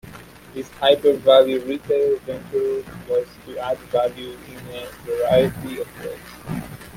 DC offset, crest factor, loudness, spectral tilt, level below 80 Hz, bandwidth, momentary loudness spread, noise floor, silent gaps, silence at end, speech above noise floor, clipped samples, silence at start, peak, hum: under 0.1%; 20 dB; -21 LUFS; -5.5 dB/octave; -50 dBFS; 16.5 kHz; 20 LU; -41 dBFS; none; 0 s; 20 dB; under 0.1%; 0.05 s; -2 dBFS; none